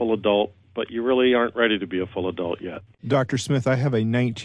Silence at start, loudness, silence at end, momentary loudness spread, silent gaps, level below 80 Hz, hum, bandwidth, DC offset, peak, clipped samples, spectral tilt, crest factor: 0 s; -23 LUFS; 0 s; 10 LU; none; -60 dBFS; none; 11 kHz; under 0.1%; -6 dBFS; under 0.1%; -6 dB/octave; 16 dB